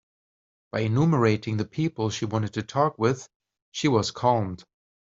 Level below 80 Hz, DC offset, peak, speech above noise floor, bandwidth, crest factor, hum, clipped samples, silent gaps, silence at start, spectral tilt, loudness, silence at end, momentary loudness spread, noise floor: -60 dBFS; under 0.1%; -8 dBFS; over 66 dB; 7.8 kHz; 18 dB; none; under 0.1%; 3.36-3.40 s, 3.62-3.72 s; 0.75 s; -6 dB/octave; -25 LUFS; 0.5 s; 11 LU; under -90 dBFS